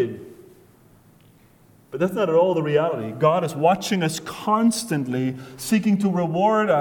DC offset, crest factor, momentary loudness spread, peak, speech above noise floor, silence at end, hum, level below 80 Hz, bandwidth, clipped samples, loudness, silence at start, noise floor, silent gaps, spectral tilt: under 0.1%; 18 dB; 9 LU; -4 dBFS; 33 dB; 0 s; none; -62 dBFS; 19 kHz; under 0.1%; -21 LUFS; 0 s; -54 dBFS; none; -5.5 dB/octave